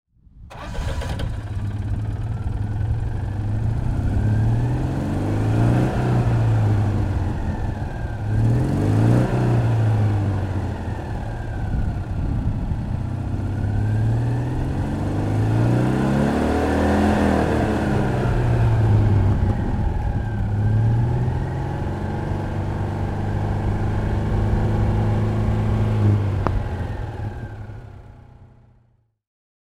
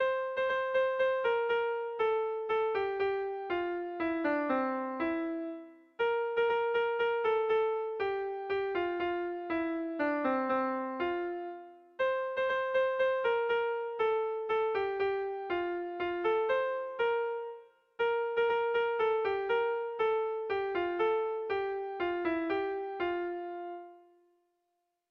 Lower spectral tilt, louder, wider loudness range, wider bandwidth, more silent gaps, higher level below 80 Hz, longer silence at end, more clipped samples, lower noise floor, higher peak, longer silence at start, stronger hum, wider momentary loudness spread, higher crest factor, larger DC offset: first, -8.5 dB/octave vs -6 dB/octave; first, -22 LUFS vs -32 LUFS; first, 6 LU vs 2 LU; first, 10.5 kHz vs 5.6 kHz; neither; first, -28 dBFS vs -70 dBFS; first, 1.3 s vs 1.1 s; neither; second, -61 dBFS vs -82 dBFS; first, 0 dBFS vs -18 dBFS; first, 0.35 s vs 0 s; neither; first, 9 LU vs 6 LU; first, 20 dB vs 14 dB; neither